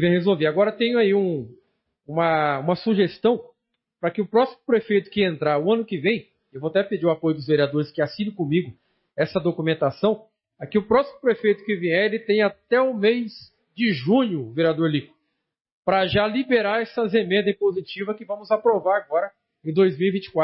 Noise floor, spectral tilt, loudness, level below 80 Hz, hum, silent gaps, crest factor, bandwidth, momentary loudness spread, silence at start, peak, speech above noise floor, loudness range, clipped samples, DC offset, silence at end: -78 dBFS; -10.5 dB/octave; -22 LUFS; -60 dBFS; none; 15.61-15.65 s, 15.72-15.83 s; 14 dB; 5.8 kHz; 9 LU; 0 s; -8 dBFS; 57 dB; 2 LU; under 0.1%; under 0.1%; 0 s